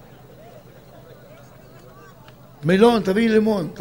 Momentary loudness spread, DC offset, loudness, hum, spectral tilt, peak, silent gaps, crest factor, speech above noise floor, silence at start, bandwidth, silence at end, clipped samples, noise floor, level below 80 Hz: 7 LU; 0.1%; -18 LUFS; none; -6.5 dB/octave; -2 dBFS; none; 20 dB; 29 dB; 0.55 s; 16 kHz; 0 s; under 0.1%; -46 dBFS; -54 dBFS